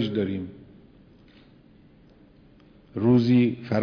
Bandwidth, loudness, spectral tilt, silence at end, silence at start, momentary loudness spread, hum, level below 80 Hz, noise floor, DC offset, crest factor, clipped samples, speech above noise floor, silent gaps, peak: 5.4 kHz; -23 LUFS; -9 dB/octave; 0 s; 0 s; 18 LU; none; -58 dBFS; -54 dBFS; under 0.1%; 18 dB; under 0.1%; 32 dB; none; -10 dBFS